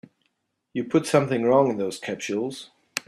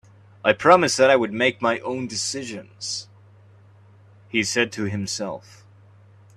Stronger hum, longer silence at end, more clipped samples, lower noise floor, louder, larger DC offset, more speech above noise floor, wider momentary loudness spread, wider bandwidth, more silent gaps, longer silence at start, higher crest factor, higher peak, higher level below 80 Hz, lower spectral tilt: neither; second, 0.05 s vs 1 s; neither; first, -74 dBFS vs -51 dBFS; second, -24 LUFS vs -21 LUFS; neither; first, 51 dB vs 29 dB; second, 13 LU vs 16 LU; first, 14.5 kHz vs 13 kHz; neither; first, 0.75 s vs 0.45 s; about the same, 20 dB vs 24 dB; second, -4 dBFS vs 0 dBFS; about the same, -66 dBFS vs -64 dBFS; first, -5.5 dB/octave vs -3.5 dB/octave